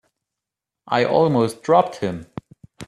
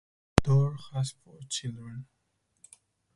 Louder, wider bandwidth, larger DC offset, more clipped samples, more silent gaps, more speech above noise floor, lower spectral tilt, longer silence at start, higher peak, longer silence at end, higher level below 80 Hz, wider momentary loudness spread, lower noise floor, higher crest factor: first, -19 LUFS vs -29 LUFS; first, 13.5 kHz vs 11.5 kHz; neither; neither; neither; first, 67 dB vs 33 dB; about the same, -6.5 dB/octave vs -5.5 dB/octave; first, 0.85 s vs 0.35 s; about the same, -2 dBFS vs 0 dBFS; second, 0.05 s vs 1.15 s; second, -58 dBFS vs -46 dBFS; about the same, 18 LU vs 20 LU; first, -86 dBFS vs -63 dBFS; second, 20 dB vs 30 dB